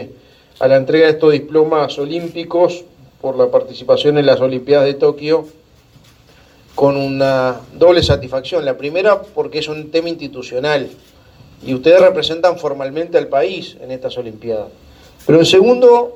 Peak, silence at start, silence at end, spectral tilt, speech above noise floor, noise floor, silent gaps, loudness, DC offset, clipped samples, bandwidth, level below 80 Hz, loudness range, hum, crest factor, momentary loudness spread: 0 dBFS; 0 s; 0 s; -5.5 dB/octave; 33 dB; -47 dBFS; none; -14 LUFS; under 0.1%; under 0.1%; 12.5 kHz; -44 dBFS; 3 LU; none; 14 dB; 15 LU